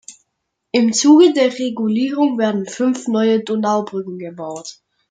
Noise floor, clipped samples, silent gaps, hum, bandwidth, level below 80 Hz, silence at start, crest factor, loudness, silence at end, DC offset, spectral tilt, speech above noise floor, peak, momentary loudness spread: -75 dBFS; under 0.1%; none; none; 9.4 kHz; -68 dBFS; 0.1 s; 16 dB; -16 LUFS; 0.4 s; under 0.1%; -4.5 dB/octave; 59 dB; -2 dBFS; 18 LU